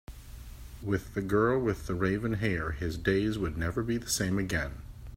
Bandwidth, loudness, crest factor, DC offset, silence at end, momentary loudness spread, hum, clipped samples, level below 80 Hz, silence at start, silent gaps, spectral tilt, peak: 16 kHz; -30 LUFS; 18 dB; under 0.1%; 0 s; 19 LU; none; under 0.1%; -44 dBFS; 0.1 s; none; -5.5 dB/octave; -12 dBFS